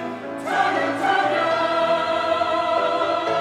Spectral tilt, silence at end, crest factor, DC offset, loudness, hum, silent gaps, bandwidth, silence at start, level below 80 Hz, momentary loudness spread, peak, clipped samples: -4 dB/octave; 0 s; 14 dB; under 0.1%; -21 LUFS; none; none; 12 kHz; 0 s; -66 dBFS; 2 LU; -6 dBFS; under 0.1%